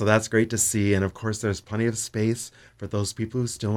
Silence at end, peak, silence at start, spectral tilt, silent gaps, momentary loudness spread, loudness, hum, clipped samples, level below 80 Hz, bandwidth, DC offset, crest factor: 0 s; -6 dBFS; 0 s; -5 dB/octave; none; 10 LU; -25 LUFS; none; under 0.1%; -54 dBFS; 18 kHz; under 0.1%; 18 dB